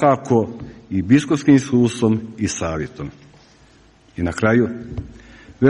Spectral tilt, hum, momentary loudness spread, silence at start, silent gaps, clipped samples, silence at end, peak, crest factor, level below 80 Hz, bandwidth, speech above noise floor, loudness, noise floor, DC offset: -6.5 dB/octave; none; 19 LU; 0 s; none; under 0.1%; 0 s; -2 dBFS; 18 dB; -44 dBFS; 11 kHz; 33 dB; -19 LUFS; -51 dBFS; under 0.1%